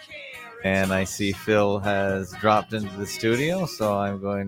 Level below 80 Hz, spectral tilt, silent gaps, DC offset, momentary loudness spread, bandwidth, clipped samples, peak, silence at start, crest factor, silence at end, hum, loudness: -54 dBFS; -5 dB/octave; none; under 0.1%; 9 LU; 17 kHz; under 0.1%; -6 dBFS; 0 s; 20 dB; 0 s; none; -24 LUFS